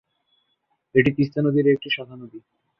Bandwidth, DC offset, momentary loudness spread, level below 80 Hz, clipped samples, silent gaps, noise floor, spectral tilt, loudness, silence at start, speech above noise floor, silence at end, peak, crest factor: 5.8 kHz; under 0.1%; 21 LU; -58 dBFS; under 0.1%; none; -72 dBFS; -9 dB/octave; -21 LUFS; 0.95 s; 51 dB; 0.4 s; -4 dBFS; 20 dB